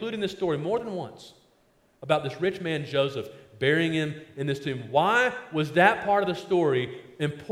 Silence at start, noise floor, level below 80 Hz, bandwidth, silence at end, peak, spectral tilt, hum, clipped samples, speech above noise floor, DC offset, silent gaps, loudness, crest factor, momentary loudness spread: 0 s; -64 dBFS; -64 dBFS; 15.5 kHz; 0 s; -4 dBFS; -6 dB/octave; none; under 0.1%; 38 dB; under 0.1%; none; -26 LUFS; 22 dB; 13 LU